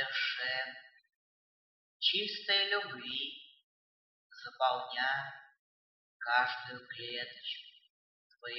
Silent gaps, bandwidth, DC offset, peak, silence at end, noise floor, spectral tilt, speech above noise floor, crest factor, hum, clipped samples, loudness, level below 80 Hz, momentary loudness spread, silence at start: 1.16-2.00 s, 3.63-4.30 s, 5.59-6.20 s, 7.90-8.30 s; 17 kHz; under 0.1%; -16 dBFS; 0 s; under -90 dBFS; -3 dB/octave; over 54 dB; 22 dB; none; under 0.1%; -34 LUFS; under -90 dBFS; 17 LU; 0 s